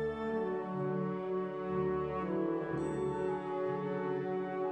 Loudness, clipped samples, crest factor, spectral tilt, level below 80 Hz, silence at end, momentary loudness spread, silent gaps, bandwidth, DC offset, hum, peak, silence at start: -36 LUFS; under 0.1%; 12 dB; -8.5 dB/octave; -62 dBFS; 0 s; 2 LU; none; 8.6 kHz; under 0.1%; none; -24 dBFS; 0 s